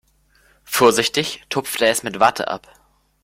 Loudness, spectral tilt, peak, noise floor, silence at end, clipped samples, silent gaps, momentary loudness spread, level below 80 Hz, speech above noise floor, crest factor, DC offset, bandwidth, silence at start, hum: -18 LUFS; -2.5 dB/octave; 0 dBFS; -57 dBFS; 0.65 s; under 0.1%; none; 11 LU; -58 dBFS; 39 dB; 20 dB; under 0.1%; 16.5 kHz; 0.7 s; none